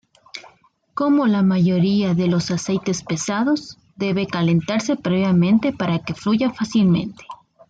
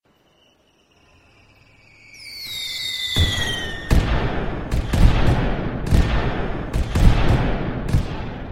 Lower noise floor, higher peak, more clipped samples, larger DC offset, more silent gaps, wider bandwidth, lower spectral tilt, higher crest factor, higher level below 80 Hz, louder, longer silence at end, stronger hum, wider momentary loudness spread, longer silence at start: about the same, -56 dBFS vs -58 dBFS; second, -8 dBFS vs -2 dBFS; neither; neither; neither; second, 9 kHz vs 16 kHz; about the same, -6.5 dB/octave vs -5.5 dB/octave; second, 12 dB vs 20 dB; second, -56 dBFS vs -24 dBFS; first, -19 LUFS vs -22 LUFS; first, 0.35 s vs 0 s; neither; first, 17 LU vs 9 LU; second, 0.35 s vs 2.15 s